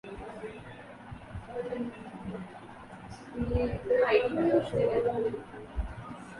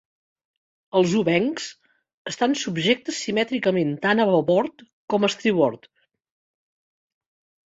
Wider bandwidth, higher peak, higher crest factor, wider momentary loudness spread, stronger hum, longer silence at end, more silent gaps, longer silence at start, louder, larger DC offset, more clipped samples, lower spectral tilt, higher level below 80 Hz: first, 11.5 kHz vs 8 kHz; second, -12 dBFS vs -6 dBFS; about the same, 20 dB vs 18 dB; first, 20 LU vs 9 LU; neither; second, 0 s vs 1.9 s; second, none vs 2.14-2.25 s, 4.93-5.08 s; second, 0.05 s vs 0.95 s; second, -31 LUFS vs -22 LUFS; neither; neither; first, -7.5 dB/octave vs -5 dB/octave; first, -46 dBFS vs -66 dBFS